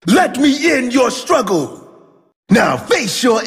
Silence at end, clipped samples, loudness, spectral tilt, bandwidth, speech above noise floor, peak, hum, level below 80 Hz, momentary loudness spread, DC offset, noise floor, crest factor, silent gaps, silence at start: 0 s; under 0.1%; -14 LUFS; -4 dB/octave; 15.5 kHz; 32 dB; -2 dBFS; none; -50 dBFS; 5 LU; under 0.1%; -45 dBFS; 14 dB; 2.36-2.43 s; 0.05 s